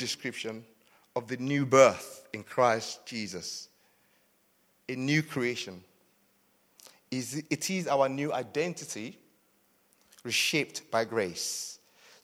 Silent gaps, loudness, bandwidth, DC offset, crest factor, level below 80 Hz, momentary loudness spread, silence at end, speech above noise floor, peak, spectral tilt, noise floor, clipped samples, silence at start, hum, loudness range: none; -30 LUFS; 16.5 kHz; under 0.1%; 26 dB; -76 dBFS; 17 LU; 0.45 s; 39 dB; -6 dBFS; -4 dB/octave; -69 dBFS; under 0.1%; 0 s; none; 7 LU